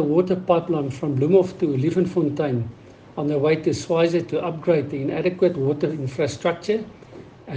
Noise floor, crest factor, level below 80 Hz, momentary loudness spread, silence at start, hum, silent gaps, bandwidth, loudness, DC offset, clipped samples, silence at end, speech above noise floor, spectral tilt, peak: -43 dBFS; 18 dB; -58 dBFS; 7 LU; 0 s; none; none; 9.4 kHz; -22 LUFS; under 0.1%; under 0.1%; 0 s; 21 dB; -7.5 dB/octave; -4 dBFS